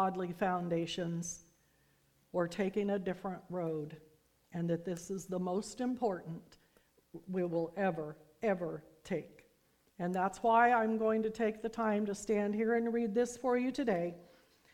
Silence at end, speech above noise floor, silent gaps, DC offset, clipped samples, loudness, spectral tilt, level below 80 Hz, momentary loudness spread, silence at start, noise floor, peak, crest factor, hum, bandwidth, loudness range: 0.5 s; 37 dB; none; under 0.1%; under 0.1%; -35 LUFS; -6 dB/octave; -70 dBFS; 11 LU; 0 s; -72 dBFS; -16 dBFS; 20 dB; none; 16 kHz; 7 LU